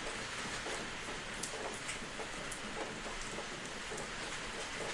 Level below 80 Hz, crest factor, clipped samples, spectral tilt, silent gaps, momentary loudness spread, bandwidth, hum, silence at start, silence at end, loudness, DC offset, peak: -56 dBFS; 22 dB; under 0.1%; -2 dB/octave; none; 2 LU; 11.5 kHz; none; 0 s; 0 s; -41 LUFS; under 0.1%; -20 dBFS